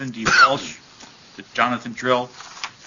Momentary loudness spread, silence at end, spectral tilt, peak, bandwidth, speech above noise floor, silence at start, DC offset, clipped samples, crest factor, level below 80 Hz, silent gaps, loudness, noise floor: 20 LU; 0.15 s; -3 dB/octave; 0 dBFS; 7.4 kHz; 25 dB; 0 s; under 0.1%; under 0.1%; 20 dB; -56 dBFS; none; -19 LUFS; -45 dBFS